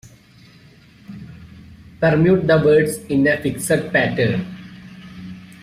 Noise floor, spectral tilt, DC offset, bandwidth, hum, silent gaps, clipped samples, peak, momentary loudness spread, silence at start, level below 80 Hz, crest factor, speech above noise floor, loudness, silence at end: -47 dBFS; -6 dB/octave; under 0.1%; 15.5 kHz; none; none; under 0.1%; -4 dBFS; 24 LU; 1.1 s; -50 dBFS; 16 dB; 31 dB; -17 LUFS; 0.15 s